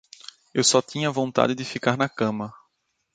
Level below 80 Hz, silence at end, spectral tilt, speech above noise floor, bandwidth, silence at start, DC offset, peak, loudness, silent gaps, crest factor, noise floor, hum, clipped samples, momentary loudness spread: -66 dBFS; 0.6 s; -3.5 dB/octave; 50 dB; 9.6 kHz; 0.55 s; under 0.1%; -2 dBFS; -23 LUFS; none; 22 dB; -73 dBFS; none; under 0.1%; 16 LU